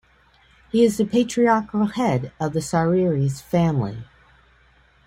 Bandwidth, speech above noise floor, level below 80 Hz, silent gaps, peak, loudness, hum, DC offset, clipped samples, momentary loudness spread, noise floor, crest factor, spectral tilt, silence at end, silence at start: 16 kHz; 36 dB; -52 dBFS; none; -6 dBFS; -21 LUFS; none; under 0.1%; under 0.1%; 7 LU; -56 dBFS; 16 dB; -6.5 dB/octave; 1 s; 0.75 s